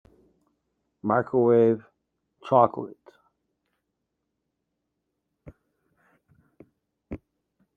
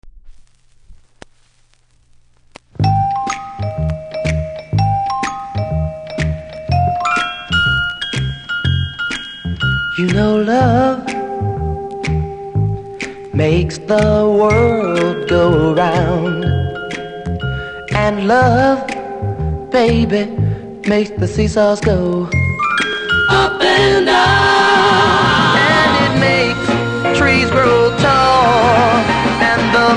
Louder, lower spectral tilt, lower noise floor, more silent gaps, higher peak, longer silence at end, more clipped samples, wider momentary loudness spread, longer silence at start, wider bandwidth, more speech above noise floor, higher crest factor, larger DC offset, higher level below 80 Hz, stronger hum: second, -23 LUFS vs -14 LUFS; first, -10 dB/octave vs -5.5 dB/octave; first, -81 dBFS vs -52 dBFS; neither; second, -4 dBFS vs 0 dBFS; first, 0.6 s vs 0 s; neither; first, 23 LU vs 11 LU; first, 1.05 s vs 0.05 s; second, 4.5 kHz vs 10.5 kHz; first, 59 dB vs 40 dB; first, 24 dB vs 14 dB; neither; second, -64 dBFS vs -30 dBFS; neither